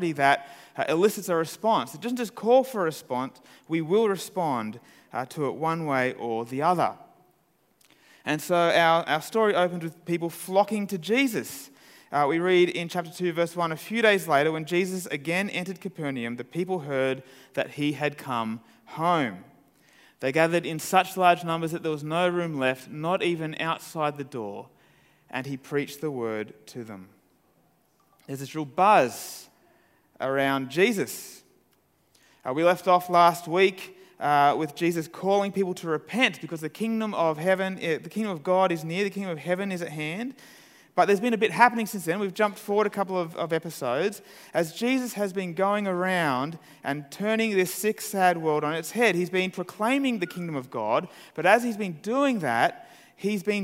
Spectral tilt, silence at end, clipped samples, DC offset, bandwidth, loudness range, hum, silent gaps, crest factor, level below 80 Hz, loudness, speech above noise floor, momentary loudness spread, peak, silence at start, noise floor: -5 dB/octave; 0 s; under 0.1%; under 0.1%; 16 kHz; 5 LU; none; none; 24 dB; -76 dBFS; -26 LUFS; 41 dB; 13 LU; -2 dBFS; 0 s; -67 dBFS